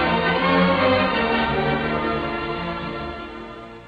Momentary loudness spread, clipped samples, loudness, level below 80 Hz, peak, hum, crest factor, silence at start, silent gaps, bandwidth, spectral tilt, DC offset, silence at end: 15 LU; under 0.1%; -21 LUFS; -40 dBFS; -6 dBFS; none; 16 dB; 0 s; none; 7.4 kHz; -7.5 dB/octave; under 0.1%; 0 s